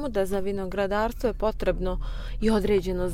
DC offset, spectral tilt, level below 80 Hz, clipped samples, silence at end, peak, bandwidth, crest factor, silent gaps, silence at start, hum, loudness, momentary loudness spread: under 0.1%; -6.5 dB/octave; -34 dBFS; under 0.1%; 0 s; -12 dBFS; 16 kHz; 14 dB; none; 0 s; none; -27 LUFS; 7 LU